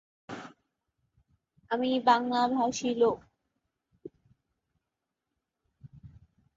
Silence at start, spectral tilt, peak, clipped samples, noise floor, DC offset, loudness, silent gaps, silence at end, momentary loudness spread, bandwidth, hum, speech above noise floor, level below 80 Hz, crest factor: 0.3 s; -4 dB/octave; -10 dBFS; under 0.1%; -86 dBFS; under 0.1%; -28 LUFS; none; 0.5 s; 20 LU; 7.8 kHz; none; 60 dB; -68 dBFS; 22 dB